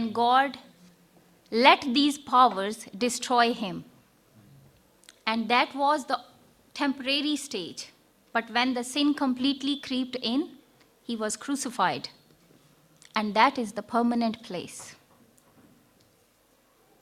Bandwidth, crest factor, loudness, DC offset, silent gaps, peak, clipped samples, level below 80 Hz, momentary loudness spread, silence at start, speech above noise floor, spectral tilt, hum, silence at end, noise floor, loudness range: 16 kHz; 26 dB; -26 LUFS; under 0.1%; none; -2 dBFS; under 0.1%; -70 dBFS; 16 LU; 0 s; 38 dB; -3 dB/octave; none; 2.1 s; -64 dBFS; 7 LU